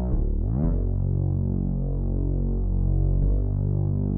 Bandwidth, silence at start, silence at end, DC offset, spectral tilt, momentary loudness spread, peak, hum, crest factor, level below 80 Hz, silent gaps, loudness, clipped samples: 1.6 kHz; 0 s; 0 s; under 0.1%; -14 dB/octave; 3 LU; -12 dBFS; none; 12 dB; -26 dBFS; none; -26 LUFS; under 0.1%